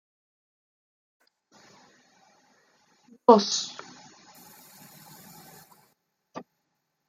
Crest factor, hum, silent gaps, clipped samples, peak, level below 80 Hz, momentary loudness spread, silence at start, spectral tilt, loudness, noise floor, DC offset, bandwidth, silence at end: 28 dB; none; none; under 0.1%; -2 dBFS; -82 dBFS; 30 LU; 3.3 s; -4 dB/octave; -22 LUFS; -78 dBFS; under 0.1%; 16 kHz; 0.7 s